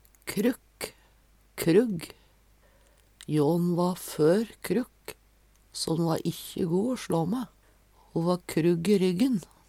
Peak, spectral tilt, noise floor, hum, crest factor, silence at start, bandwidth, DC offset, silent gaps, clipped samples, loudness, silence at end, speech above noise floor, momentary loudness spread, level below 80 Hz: -10 dBFS; -6 dB/octave; -61 dBFS; none; 20 dB; 0.25 s; 16.5 kHz; under 0.1%; none; under 0.1%; -27 LUFS; 0.25 s; 35 dB; 16 LU; -60 dBFS